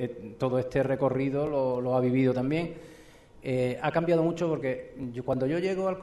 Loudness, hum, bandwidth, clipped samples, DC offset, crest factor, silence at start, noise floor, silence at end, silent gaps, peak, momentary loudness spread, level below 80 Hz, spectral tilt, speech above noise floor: -28 LUFS; none; 12 kHz; under 0.1%; under 0.1%; 14 dB; 0 s; -52 dBFS; 0 s; none; -14 dBFS; 10 LU; -58 dBFS; -8 dB/octave; 24 dB